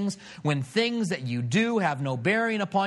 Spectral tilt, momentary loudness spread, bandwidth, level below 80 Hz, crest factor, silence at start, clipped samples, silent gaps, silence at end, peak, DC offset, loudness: -5.5 dB/octave; 5 LU; 12 kHz; -70 dBFS; 18 dB; 0 s; under 0.1%; none; 0 s; -10 dBFS; under 0.1%; -26 LUFS